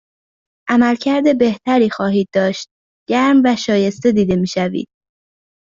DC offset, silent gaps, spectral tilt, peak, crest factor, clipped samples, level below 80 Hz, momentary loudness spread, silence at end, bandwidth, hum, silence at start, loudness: under 0.1%; 2.71-3.06 s; -6 dB/octave; -2 dBFS; 14 dB; under 0.1%; -52 dBFS; 11 LU; 0.8 s; 7.6 kHz; none; 0.65 s; -15 LUFS